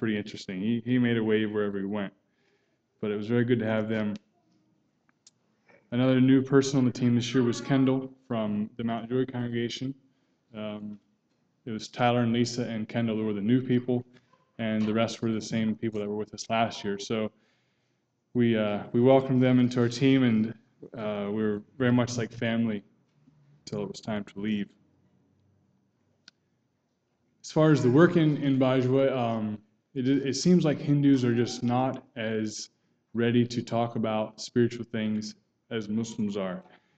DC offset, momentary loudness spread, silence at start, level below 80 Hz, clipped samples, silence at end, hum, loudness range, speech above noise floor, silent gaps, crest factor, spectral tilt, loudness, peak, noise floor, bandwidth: under 0.1%; 14 LU; 0 s; -66 dBFS; under 0.1%; 0.35 s; none; 8 LU; 49 dB; none; 20 dB; -6.5 dB/octave; -27 LUFS; -6 dBFS; -75 dBFS; 8.4 kHz